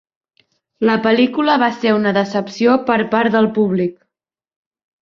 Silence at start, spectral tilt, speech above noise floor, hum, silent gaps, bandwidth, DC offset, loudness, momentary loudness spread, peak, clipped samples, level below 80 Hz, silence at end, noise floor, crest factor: 0.8 s; -6.5 dB/octave; 68 dB; none; none; 7 kHz; under 0.1%; -16 LUFS; 5 LU; -2 dBFS; under 0.1%; -60 dBFS; 1.1 s; -83 dBFS; 16 dB